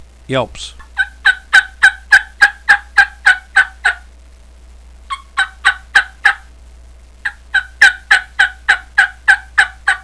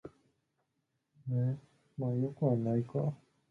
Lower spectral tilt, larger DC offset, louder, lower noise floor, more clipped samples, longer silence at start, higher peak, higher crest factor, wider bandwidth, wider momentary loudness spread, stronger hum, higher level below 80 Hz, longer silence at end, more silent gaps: second, -1.5 dB/octave vs -11.5 dB/octave; first, 0.3% vs under 0.1%; first, -12 LUFS vs -35 LUFS; second, -40 dBFS vs -82 dBFS; first, 0.4% vs under 0.1%; first, 0.3 s vs 0.05 s; first, 0 dBFS vs -18 dBFS; about the same, 14 dB vs 18 dB; first, 11 kHz vs 3.6 kHz; second, 15 LU vs 18 LU; neither; first, -40 dBFS vs -72 dBFS; second, 0.05 s vs 0.35 s; neither